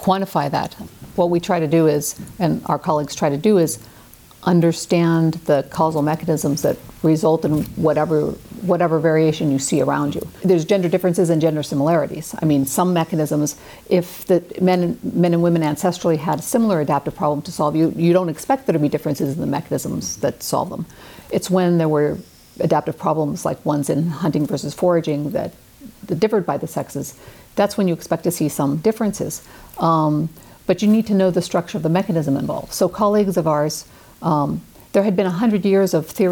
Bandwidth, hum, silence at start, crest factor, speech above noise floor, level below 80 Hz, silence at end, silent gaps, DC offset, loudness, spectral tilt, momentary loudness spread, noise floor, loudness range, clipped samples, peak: 19.5 kHz; none; 0 s; 14 dB; 26 dB; -52 dBFS; 0 s; none; under 0.1%; -19 LUFS; -6.5 dB/octave; 8 LU; -44 dBFS; 3 LU; under 0.1%; -6 dBFS